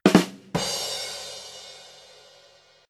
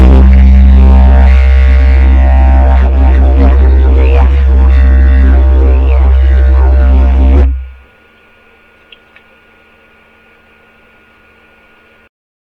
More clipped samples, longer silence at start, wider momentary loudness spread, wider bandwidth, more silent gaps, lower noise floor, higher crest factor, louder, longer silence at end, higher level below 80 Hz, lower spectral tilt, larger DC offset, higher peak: second, under 0.1% vs 2%; about the same, 0.05 s vs 0 s; first, 25 LU vs 3 LU; first, 16 kHz vs 3.9 kHz; neither; first, -56 dBFS vs -43 dBFS; first, 26 dB vs 6 dB; second, -26 LUFS vs -7 LUFS; second, 1 s vs 4.8 s; second, -58 dBFS vs -6 dBFS; second, -4.5 dB/octave vs -9.5 dB/octave; neither; about the same, -2 dBFS vs 0 dBFS